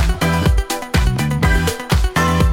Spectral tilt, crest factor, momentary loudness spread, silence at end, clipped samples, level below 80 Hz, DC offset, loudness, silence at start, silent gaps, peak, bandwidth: -5 dB/octave; 14 dB; 3 LU; 0 s; under 0.1%; -20 dBFS; under 0.1%; -17 LUFS; 0 s; none; -2 dBFS; 17 kHz